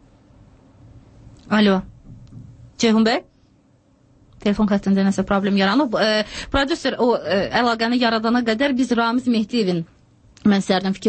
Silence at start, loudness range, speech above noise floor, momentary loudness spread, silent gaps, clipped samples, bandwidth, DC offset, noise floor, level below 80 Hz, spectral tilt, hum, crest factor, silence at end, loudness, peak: 1.5 s; 3 LU; 38 dB; 5 LU; none; under 0.1%; 8.8 kHz; under 0.1%; -56 dBFS; -44 dBFS; -5.5 dB/octave; none; 16 dB; 0 s; -19 LUFS; -4 dBFS